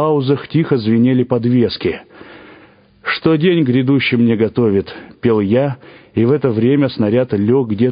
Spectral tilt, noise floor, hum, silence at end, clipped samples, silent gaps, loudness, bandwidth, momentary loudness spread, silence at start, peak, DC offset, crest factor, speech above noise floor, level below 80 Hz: -12.5 dB/octave; -46 dBFS; none; 0 s; under 0.1%; none; -15 LUFS; 5.2 kHz; 8 LU; 0 s; 0 dBFS; under 0.1%; 14 dB; 31 dB; -46 dBFS